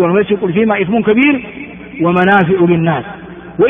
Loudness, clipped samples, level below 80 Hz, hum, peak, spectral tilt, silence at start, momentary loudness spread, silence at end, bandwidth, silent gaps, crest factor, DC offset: -12 LUFS; under 0.1%; -46 dBFS; none; 0 dBFS; -9.5 dB/octave; 0 s; 18 LU; 0 s; 3.7 kHz; none; 12 dB; under 0.1%